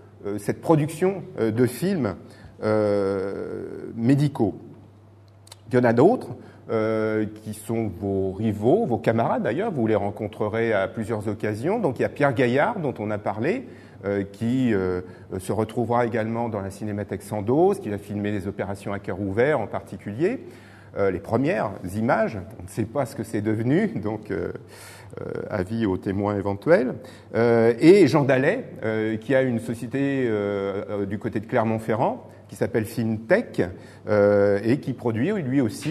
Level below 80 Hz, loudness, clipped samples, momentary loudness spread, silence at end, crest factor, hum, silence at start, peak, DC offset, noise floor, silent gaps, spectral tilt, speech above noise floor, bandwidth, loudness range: -60 dBFS; -24 LUFS; under 0.1%; 11 LU; 0 s; 20 dB; none; 0.05 s; -4 dBFS; under 0.1%; -50 dBFS; none; -7.5 dB/octave; 27 dB; 13.5 kHz; 6 LU